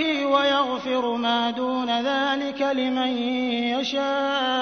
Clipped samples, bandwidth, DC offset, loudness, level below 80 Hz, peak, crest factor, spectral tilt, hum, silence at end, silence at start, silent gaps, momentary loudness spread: under 0.1%; 6.6 kHz; under 0.1%; -23 LUFS; -62 dBFS; -8 dBFS; 16 dB; -3.5 dB/octave; none; 0 s; 0 s; none; 4 LU